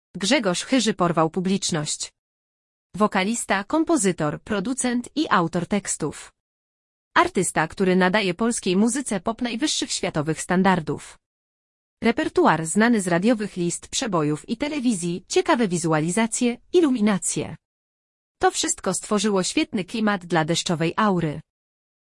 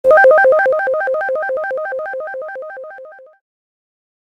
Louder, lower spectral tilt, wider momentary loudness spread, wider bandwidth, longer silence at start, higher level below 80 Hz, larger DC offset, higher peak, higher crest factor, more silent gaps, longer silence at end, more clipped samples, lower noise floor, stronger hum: second, -22 LUFS vs -14 LUFS; about the same, -4 dB/octave vs -4 dB/octave; second, 7 LU vs 22 LU; first, 12 kHz vs 5.8 kHz; about the same, 0.15 s vs 0.05 s; first, -56 dBFS vs -64 dBFS; neither; second, -4 dBFS vs 0 dBFS; about the same, 20 dB vs 16 dB; first, 2.19-2.90 s, 6.40-7.11 s, 11.26-11.97 s, 17.65-18.35 s vs none; second, 0.75 s vs 1.15 s; neither; first, under -90 dBFS vs -37 dBFS; neither